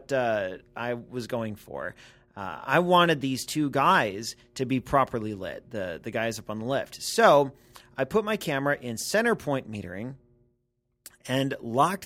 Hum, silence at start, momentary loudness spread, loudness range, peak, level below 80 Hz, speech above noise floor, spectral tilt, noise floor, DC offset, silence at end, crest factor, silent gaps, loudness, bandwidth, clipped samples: none; 0 s; 16 LU; 5 LU; -6 dBFS; -58 dBFS; 49 dB; -4.5 dB/octave; -76 dBFS; under 0.1%; 0 s; 22 dB; none; -27 LUFS; 16.5 kHz; under 0.1%